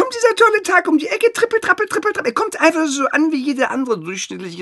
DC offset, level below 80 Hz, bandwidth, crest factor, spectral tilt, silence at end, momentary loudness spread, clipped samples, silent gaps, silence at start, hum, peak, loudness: under 0.1%; -64 dBFS; 12 kHz; 16 dB; -3 dB/octave; 0 s; 8 LU; under 0.1%; none; 0 s; none; 0 dBFS; -16 LUFS